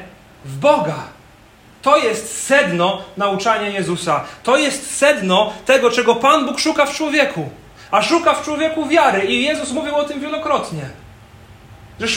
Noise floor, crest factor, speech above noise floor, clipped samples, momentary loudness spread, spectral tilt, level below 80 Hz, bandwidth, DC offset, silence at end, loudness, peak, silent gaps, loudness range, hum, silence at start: -46 dBFS; 18 dB; 29 dB; under 0.1%; 9 LU; -3.5 dB/octave; -52 dBFS; 16.5 kHz; under 0.1%; 0 s; -16 LUFS; 0 dBFS; none; 3 LU; none; 0 s